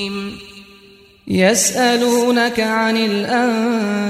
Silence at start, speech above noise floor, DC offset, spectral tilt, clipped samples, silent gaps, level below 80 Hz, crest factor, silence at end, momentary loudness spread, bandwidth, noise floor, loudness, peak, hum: 0 s; 30 dB; under 0.1%; -3.5 dB/octave; under 0.1%; none; -54 dBFS; 14 dB; 0 s; 11 LU; 15.5 kHz; -46 dBFS; -16 LUFS; -2 dBFS; none